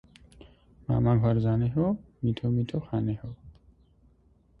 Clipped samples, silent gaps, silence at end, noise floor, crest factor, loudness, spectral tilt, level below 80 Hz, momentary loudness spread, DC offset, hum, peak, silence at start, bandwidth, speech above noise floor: under 0.1%; none; 1.1 s; -62 dBFS; 16 dB; -28 LUFS; -10.5 dB/octave; -50 dBFS; 15 LU; under 0.1%; none; -12 dBFS; 0.9 s; 4.8 kHz; 36 dB